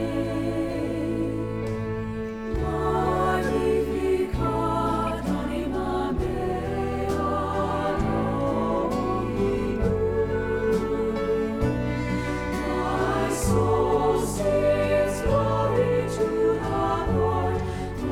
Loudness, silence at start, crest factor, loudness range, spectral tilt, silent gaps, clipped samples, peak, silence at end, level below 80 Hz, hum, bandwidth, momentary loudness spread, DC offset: -25 LUFS; 0 s; 14 dB; 3 LU; -6.5 dB/octave; none; under 0.1%; -10 dBFS; 0 s; -36 dBFS; none; 16.5 kHz; 5 LU; under 0.1%